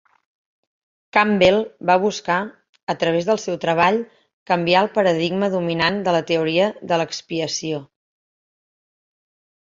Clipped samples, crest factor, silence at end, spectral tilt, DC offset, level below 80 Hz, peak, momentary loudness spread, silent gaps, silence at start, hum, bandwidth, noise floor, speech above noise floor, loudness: under 0.1%; 20 dB; 1.9 s; -4.5 dB/octave; under 0.1%; -58 dBFS; 0 dBFS; 9 LU; 2.69-2.73 s, 2.83-2.87 s, 4.33-4.46 s; 1.15 s; none; 7.6 kHz; under -90 dBFS; over 71 dB; -19 LUFS